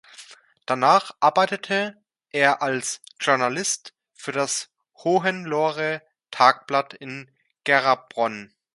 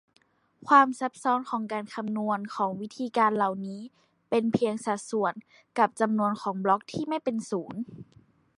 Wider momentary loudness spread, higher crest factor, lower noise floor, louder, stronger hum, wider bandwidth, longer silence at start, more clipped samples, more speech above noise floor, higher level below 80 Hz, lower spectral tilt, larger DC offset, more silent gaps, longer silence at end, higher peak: about the same, 16 LU vs 14 LU; about the same, 24 dB vs 22 dB; second, -48 dBFS vs -56 dBFS; first, -22 LUFS vs -27 LUFS; neither; about the same, 11.5 kHz vs 11.5 kHz; second, 0.2 s vs 0.65 s; neither; about the same, 26 dB vs 29 dB; about the same, -74 dBFS vs -72 dBFS; second, -3 dB/octave vs -5.5 dB/octave; neither; neither; second, 0.3 s vs 0.55 s; first, 0 dBFS vs -6 dBFS